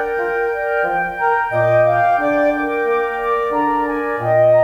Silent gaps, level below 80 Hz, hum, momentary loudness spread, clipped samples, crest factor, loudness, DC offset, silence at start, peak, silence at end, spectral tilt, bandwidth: none; -46 dBFS; none; 5 LU; under 0.1%; 12 dB; -17 LUFS; under 0.1%; 0 s; -4 dBFS; 0 s; -7.5 dB/octave; 11 kHz